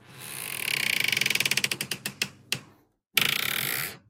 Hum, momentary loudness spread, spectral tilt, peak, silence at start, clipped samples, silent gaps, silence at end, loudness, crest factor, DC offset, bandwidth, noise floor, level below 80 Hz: none; 10 LU; -0.5 dB/octave; -2 dBFS; 0.1 s; under 0.1%; none; 0.1 s; -26 LUFS; 28 dB; under 0.1%; 17 kHz; -60 dBFS; -70 dBFS